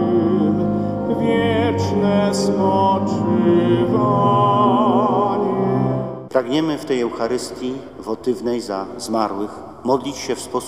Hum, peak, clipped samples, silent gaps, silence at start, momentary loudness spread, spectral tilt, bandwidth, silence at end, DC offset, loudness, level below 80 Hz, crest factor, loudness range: none; -2 dBFS; under 0.1%; none; 0 s; 10 LU; -6.5 dB/octave; 13.5 kHz; 0 s; 0.2%; -19 LUFS; -50 dBFS; 16 dB; 7 LU